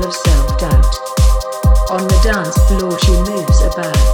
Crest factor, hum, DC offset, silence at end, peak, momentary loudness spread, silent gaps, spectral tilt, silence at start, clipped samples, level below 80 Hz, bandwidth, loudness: 10 dB; none; under 0.1%; 0 s; 0 dBFS; 2 LU; none; -5.5 dB/octave; 0 s; under 0.1%; -12 dBFS; 17.5 kHz; -14 LUFS